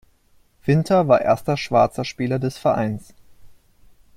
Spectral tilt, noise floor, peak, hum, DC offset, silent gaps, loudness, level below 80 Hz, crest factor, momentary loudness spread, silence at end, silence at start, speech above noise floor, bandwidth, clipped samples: -7 dB/octave; -57 dBFS; -2 dBFS; none; under 0.1%; none; -20 LUFS; -52 dBFS; 18 dB; 10 LU; 0.65 s; 0.65 s; 38 dB; 15.5 kHz; under 0.1%